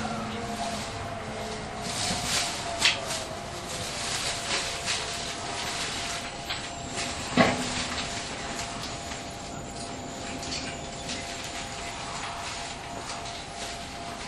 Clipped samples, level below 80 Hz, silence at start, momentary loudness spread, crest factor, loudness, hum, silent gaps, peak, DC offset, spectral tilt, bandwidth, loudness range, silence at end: under 0.1%; -48 dBFS; 0 s; 12 LU; 28 dB; -31 LUFS; none; none; -4 dBFS; under 0.1%; -2.5 dB/octave; 13 kHz; 7 LU; 0 s